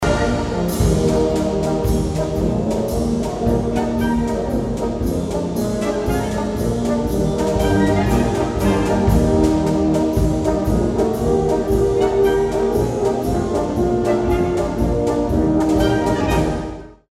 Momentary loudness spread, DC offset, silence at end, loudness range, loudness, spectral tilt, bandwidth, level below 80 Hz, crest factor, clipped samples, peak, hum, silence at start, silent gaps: 5 LU; under 0.1%; 0.2 s; 3 LU; -18 LUFS; -7 dB/octave; 16 kHz; -28 dBFS; 14 dB; under 0.1%; -2 dBFS; none; 0 s; none